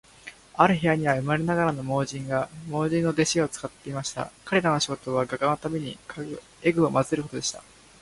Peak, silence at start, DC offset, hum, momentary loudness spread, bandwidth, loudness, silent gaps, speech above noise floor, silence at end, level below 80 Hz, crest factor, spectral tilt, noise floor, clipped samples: -2 dBFS; 0.25 s; under 0.1%; none; 14 LU; 11.5 kHz; -26 LUFS; none; 22 dB; 0.4 s; -56 dBFS; 24 dB; -5 dB/octave; -48 dBFS; under 0.1%